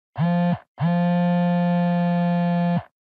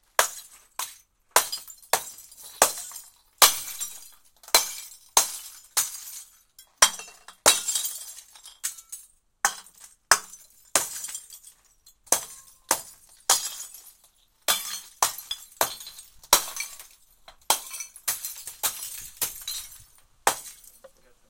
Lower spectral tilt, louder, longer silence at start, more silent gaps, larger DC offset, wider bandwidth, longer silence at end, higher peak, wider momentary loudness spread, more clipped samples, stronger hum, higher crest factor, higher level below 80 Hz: first, -11 dB/octave vs 1.5 dB/octave; first, -21 LUFS vs -25 LUFS; about the same, 0.15 s vs 0.2 s; first, 0.68-0.75 s vs none; neither; second, 4.6 kHz vs 17 kHz; second, 0.2 s vs 0.45 s; second, -12 dBFS vs 0 dBFS; second, 4 LU vs 22 LU; neither; neither; second, 8 dB vs 30 dB; about the same, -66 dBFS vs -62 dBFS